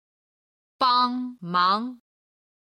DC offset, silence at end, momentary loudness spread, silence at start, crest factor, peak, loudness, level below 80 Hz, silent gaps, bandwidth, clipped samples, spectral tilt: under 0.1%; 0.8 s; 10 LU; 0.8 s; 18 dB; -8 dBFS; -23 LUFS; -76 dBFS; none; 12 kHz; under 0.1%; -5.5 dB/octave